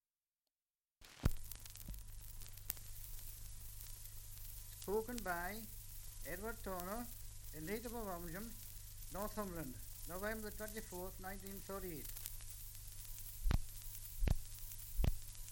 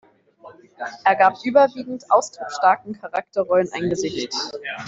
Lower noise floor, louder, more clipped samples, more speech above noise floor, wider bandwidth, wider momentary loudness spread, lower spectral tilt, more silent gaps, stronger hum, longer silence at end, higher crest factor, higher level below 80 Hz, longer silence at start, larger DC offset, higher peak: first, under -90 dBFS vs -47 dBFS; second, -47 LUFS vs -20 LUFS; neither; first, over 45 dB vs 26 dB; first, 17 kHz vs 8 kHz; about the same, 10 LU vs 12 LU; about the same, -4.5 dB/octave vs -4 dB/octave; neither; neither; about the same, 0 s vs 0 s; first, 30 dB vs 18 dB; first, -48 dBFS vs -62 dBFS; first, 1 s vs 0.45 s; neither; second, -16 dBFS vs -2 dBFS